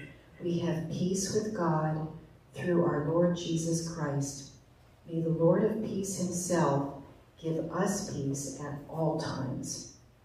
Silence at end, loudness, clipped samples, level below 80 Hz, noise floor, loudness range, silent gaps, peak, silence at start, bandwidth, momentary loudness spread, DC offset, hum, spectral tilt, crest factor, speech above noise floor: 0.3 s; -32 LUFS; under 0.1%; -60 dBFS; -58 dBFS; 2 LU; none; -14 dBFS; 0 s; 15 kHz; 12 LU; under 0.1%; none; -5.5 dB/octave; 18 dB; 28 dB